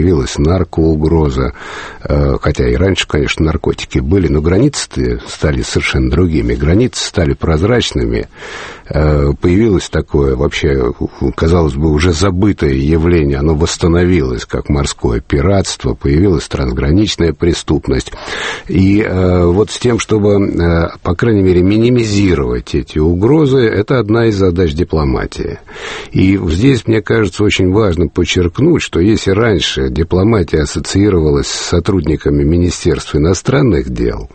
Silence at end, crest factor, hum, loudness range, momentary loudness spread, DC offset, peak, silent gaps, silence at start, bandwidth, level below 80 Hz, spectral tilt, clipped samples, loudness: 0.1 s; 12 dB; none; 2 LU; 7 LU; under 0.1%; 0 dBFS; none; 0 s; 8.8 kHz; -22 dBFS; -6 dB/octave; under 0.1%; -12 LUFS